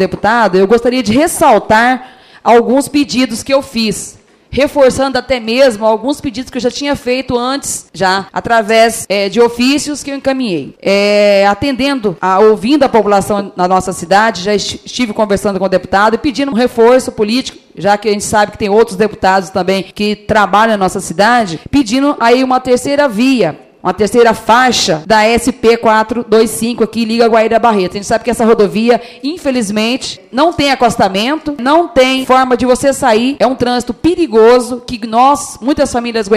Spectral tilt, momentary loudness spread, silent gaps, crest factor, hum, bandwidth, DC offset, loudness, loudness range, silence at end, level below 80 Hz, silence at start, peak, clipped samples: -4 dB/octave; 8 LU; none; 10 dB; none; 15.5 kHz; under 0.1%; -11 LUFS; 3 LU; 0 s; -40 dBFS; 0 s; 0 dBFS; 0.2%